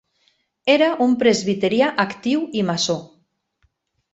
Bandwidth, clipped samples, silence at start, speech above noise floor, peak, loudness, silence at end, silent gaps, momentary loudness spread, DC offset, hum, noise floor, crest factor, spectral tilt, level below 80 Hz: 8.2 kHz; under 0.1%; 0.65 s; 48 dB; -2 dBFS; -19 LUFS; 1.1 s; none; 6 LU; under 0.1%; none; -66 dBFS; 20 dB; -4.5 dB/octave; -62 dBFS